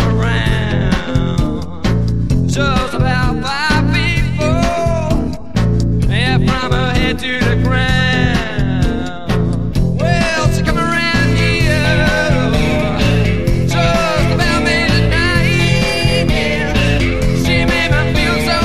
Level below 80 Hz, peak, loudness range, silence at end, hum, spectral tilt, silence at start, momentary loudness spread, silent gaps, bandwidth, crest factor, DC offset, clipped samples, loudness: -22 dBFS; 0 dBFS; 2 LU; 0 s; none; -5.5 dB/octave; 0 s; 4 LU; none; 14.5 kHz; 12 dB; 5%; under 0.1%; -14 LUFS